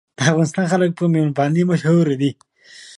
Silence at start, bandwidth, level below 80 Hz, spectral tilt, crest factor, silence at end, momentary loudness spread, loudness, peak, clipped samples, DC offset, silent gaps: 0.2 s; 11 kHz; -62 dBFS; -6.5 dB/octave; 16 dB; 0.1 s; 3 LU; -18 LUFS; -2 dBFS; under 0.1%; under 0.1%; none